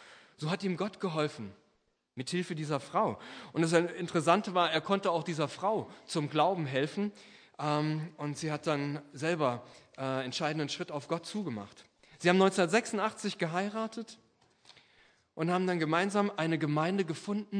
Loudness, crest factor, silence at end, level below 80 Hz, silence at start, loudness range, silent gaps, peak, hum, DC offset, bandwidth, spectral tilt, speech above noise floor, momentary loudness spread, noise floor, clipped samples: -32 LUFS; 22 dB; 0 s; -80 dBFS; 0 s; 4 LU; none; -10 dBFS; none; under 0.1%; 10.5 kHz; -5.5 dB/octave; 43 dB; 12 LU; -75 dBFS; under 0.1%